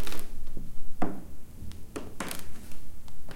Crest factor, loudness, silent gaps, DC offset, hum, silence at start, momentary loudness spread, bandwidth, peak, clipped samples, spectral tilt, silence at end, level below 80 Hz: 14 dB; -41 LUFS; none; under 0.1%; none; 0 s; 13 LU; 16 kHz; -10 dBFS; under 0.1%; -4.5 dB/octave; 0 s; -40 dBFS